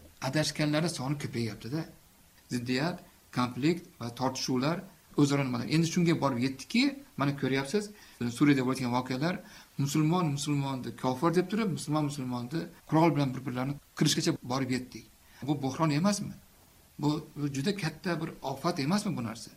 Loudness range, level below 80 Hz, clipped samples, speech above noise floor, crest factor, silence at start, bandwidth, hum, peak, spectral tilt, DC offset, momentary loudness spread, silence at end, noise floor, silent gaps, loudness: 4 LU; -62 dBFS; under 0.1%; 29 dB; 18 dB; 0 s; 16 kHz; none; -12 dBFS; -5.5 dB/octave; under 0.1%; 10 LU; 0.05 s; -60 dBFS; none; -31 LUFS